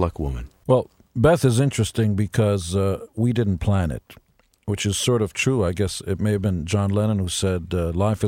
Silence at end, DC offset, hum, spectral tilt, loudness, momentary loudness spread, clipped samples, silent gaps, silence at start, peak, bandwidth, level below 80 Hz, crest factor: 0 s; under 0.1%; none; -6 dB/octave; -22 LUFS; 8 LU; under 0.1%; none; 0 s; -4 dBFS; 16 kHz; -40 dBFS; 16 dB